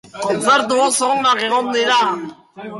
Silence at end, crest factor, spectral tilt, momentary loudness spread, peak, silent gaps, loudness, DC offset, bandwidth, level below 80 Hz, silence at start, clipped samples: 0 s; 14 dB; -2 dB/octave; 11 LU; -4 dBFS; none; -16 LUFS; under 0.1%; 11.5 kHz; -64 dBFS; 0.15 s; under 0.1%